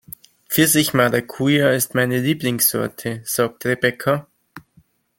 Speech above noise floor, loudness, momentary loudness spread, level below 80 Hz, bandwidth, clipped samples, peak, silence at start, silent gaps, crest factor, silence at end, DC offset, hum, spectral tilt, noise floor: 38 dB; -18 LUFS; 9 LU; -58 dBFS; 17 kHz; under 0.1%; 0 dBFS; 0.5 s; none; 20 dB; 0.6 s; under 0.1%; none; -4 dB/octave; -57 dBFS